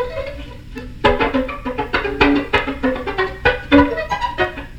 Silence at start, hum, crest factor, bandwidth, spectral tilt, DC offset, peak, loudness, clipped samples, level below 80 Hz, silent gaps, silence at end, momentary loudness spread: 0 s; none; 18 dB; 8.8 kHz; -6 dB/octave; under 0.1%; 0 dBFS; -18 LUFS; under 0.1%; -32 dBFS; none; 0 s; 16 LU